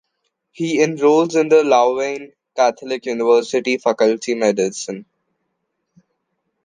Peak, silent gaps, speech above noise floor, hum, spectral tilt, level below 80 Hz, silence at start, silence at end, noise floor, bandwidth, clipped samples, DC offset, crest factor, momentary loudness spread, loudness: -2 dBFS; none; 57 dB; none; -4.5 dB/octave; -72 dBFS; 0.6 s; 1.65 s; -73 dBFS; 9.6 kHz; under 0.1%; under 0.1%; 16 dB; 13 LU; -17 LUFS